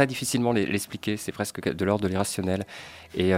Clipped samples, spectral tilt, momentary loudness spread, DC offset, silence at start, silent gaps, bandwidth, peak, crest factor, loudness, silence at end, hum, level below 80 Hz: under 0.1%; -5 dB/octave; 8 LU; under 0.1%; 0 s; none; 16 kHz; -6 dBFS; 20 dB; -27 LUFS; 0 s; none; -58 dBFS